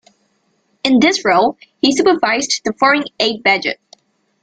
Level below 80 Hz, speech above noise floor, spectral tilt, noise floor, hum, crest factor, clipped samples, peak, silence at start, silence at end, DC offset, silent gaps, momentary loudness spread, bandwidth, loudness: -56 dBFS; 48 dB; -2.5 dB/octave; -62 dBFS; none; 16 dB; under 0.1%; 0 dBFS; 0.85 s; 0.7 s; under 0.1%; none; 7 LU; 9.2 kHz; -14 LUFS